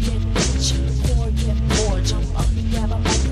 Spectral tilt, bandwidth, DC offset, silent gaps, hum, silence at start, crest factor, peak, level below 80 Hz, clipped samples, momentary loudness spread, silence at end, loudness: -4.5 dB/octave; 13 kHz; under 0.1%; none; none; 0 s; 12 dB; -8 dBFS; -20 dBFS; under 0.1%; 3 LU; 0 s; -21 LUFS